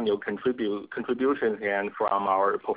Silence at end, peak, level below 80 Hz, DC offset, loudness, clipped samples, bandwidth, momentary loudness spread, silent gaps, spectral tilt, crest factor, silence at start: 0 s; -10 dBFS; -66 dBFS; under 0.1%; -27 LUFS; under 0.1%; 4 kHz; 6 LU; none; -9 dB/octave; 16 dB; 0 s